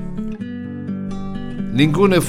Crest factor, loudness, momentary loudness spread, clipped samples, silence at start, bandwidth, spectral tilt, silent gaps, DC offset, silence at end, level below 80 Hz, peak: 18 dB; -21 LUFS; 14 LU; under 0.1%; 0 s; 16 kHz; -6 dB/octave; none; under 0.1%; 0 s; -36 dBFS; -2 dBFS